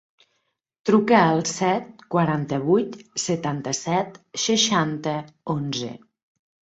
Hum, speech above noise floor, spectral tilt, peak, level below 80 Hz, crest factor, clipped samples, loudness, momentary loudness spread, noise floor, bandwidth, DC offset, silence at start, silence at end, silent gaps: none; 52 dB; -4.5 dB/octave; -2 dBFS; -64 dBFS; 22 dB; under 0.1%; -23 LUFS; 12 LU; -74 dBFS; 8.2 kHz; under 0.1%; 0.85 s; 0.8 s; none